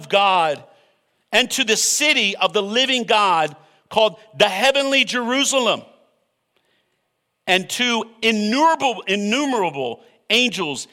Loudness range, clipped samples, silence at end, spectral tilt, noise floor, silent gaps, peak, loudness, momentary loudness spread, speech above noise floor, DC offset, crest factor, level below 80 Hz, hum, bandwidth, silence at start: 4 LU; under 0.1%; 0.05 s; -2 dB/octave; -72 dBFS; none; -2 dBFS; -18 LUFS; 8 LU; 54 dB; under 0.1%; 18 dB; -66 dBFS; none; 16.5 kHz; 0 s